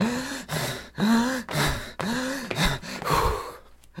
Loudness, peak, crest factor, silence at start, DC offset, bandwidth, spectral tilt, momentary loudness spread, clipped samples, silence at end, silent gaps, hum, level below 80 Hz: -26 LUFS; -10 dBFS; 18 dB; 0 s; under 0.1%; 16.5 kHz; -4.5 dB/octave; 8 LU; under 0.1%; 0 s; none; none; -40 dBFS